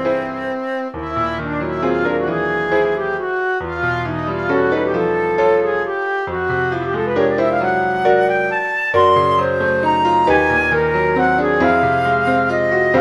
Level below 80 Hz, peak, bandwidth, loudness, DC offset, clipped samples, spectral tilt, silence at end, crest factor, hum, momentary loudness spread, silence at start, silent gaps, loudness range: -42 dBFS; -2 dBFS; 11 kHz; -17 LUFS; 0.1%; under 0.1%; -7 dB/octave; 0 s; 16 dB; none; 7 LU; 0 s; none; 4 LU